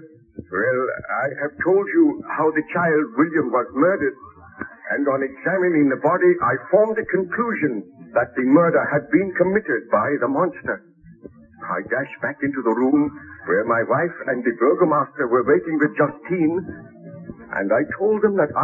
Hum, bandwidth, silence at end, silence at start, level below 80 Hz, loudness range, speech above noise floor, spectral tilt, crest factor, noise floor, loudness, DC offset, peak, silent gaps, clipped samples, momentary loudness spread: none; 3 kHz; 0 s; 0 s; -60 dBFS; 4 LU; 24 dB; -11 dB/octave; 18 dB; -44 dBFS; -20 LUFS; under 0.1%; -2 dBFS; none; under 0.1%; 11 LU